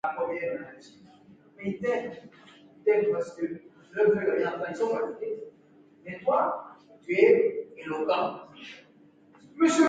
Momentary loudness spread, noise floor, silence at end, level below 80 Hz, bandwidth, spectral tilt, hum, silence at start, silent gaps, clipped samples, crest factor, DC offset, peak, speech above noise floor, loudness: 21 LU; -58 dBFS; 0 s; -72 dBFS; 9.2 kHz; -5 dB/octave; none; 0.05 s; none; under 0.1%; 22 dB; under 0.1%; -8 dBFS; 31 dB; -28 LUFS